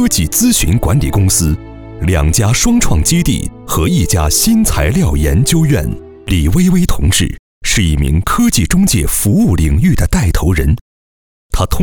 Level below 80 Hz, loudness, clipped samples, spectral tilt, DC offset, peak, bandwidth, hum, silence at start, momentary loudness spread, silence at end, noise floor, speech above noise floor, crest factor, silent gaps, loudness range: -20 dBFS; -12 LUFS; under 0.1%; -4.5 dB/octave; under 0.1%; 0 dBFS; over 20 kHz; none; 0 s; 8 LU; 0 s; under -90 dBFS; over 79 dB; 10 dB; 7.39-7.61 s, 10.81-11.50 s; 1 LU